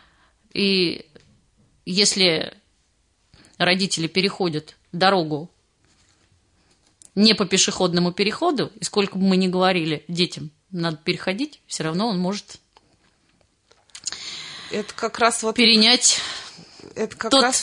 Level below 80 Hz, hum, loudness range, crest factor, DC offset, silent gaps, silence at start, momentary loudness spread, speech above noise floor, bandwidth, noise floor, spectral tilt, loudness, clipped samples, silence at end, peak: -64 dBFS; none; 9 LU; 20 dB; under 0.1%; none; 0.55 s; 16 LU; 44 dB; 11 kHz; -65 dBFS; -3 dB/octave; -20 LUFS; under 0.1%; 0 s; -2 dBFS